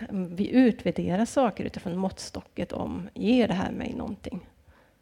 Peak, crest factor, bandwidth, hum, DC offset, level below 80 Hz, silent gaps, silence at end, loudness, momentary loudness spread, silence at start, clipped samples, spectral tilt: -10 dBFS; 18 dB; 11.5 kHz; none; under 0.1%; -52 dBFS; none; 0.6 s; -27 LUFS; 15 LU; 0 s; under 0.1%; -6.5 dB/octave